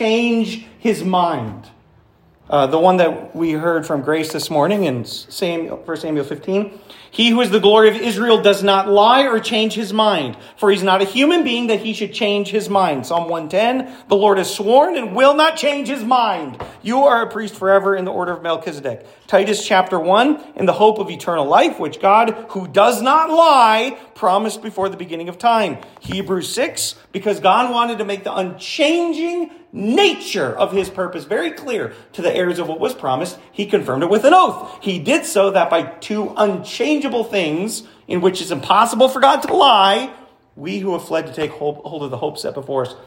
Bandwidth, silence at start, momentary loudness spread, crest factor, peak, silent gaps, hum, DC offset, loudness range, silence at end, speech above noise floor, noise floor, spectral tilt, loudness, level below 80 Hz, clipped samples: 16.5 kHz; 0 s; 12 LU; 16 dB; 0 dBFS; none; none; under 0.1%; 5 LU; 0.05 s; 35 dB; -52 dBFS; -4 dB/octave; -16 LUFS; -60 dBFS; under 0.1%